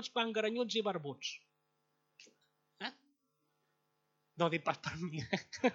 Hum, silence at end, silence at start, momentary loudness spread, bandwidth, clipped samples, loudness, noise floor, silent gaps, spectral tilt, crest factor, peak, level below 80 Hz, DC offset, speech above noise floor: none; 0 s; 0 s; 11 LU; 7.8 kHz; under 0.1%; -38 LUFS; -81 dBFS; none; -4.5 dB/octave; 24 dB; -16 dBFS; -76 dBFS; under 0.1%; 44 dB